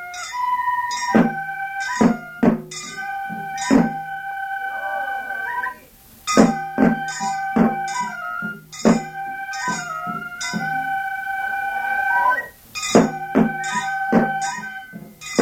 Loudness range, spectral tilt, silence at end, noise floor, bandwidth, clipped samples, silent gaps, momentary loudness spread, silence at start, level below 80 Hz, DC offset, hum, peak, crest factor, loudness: 4 LU; -4.5 dB/octave; 0 s; -47 dBFS; 16.5 kHz; under 0.1%; none; 11 LU; 0 s; -52 dBFS; under 0.1%; none; -2 dBFS; 20 dB; -21 LUFS